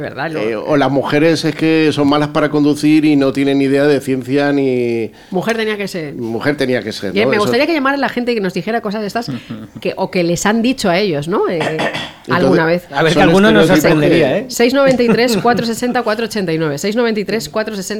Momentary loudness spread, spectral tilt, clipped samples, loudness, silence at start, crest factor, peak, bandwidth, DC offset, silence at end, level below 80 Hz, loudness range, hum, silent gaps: 9 LU; -5.5 dB/octave; under 0.1%; -14 LUFS; 0 s; 12 dB; 0 dBFS; 16.5 kHz; under 0.1%; 0 s; -46 dBFS; 5 LU; none; none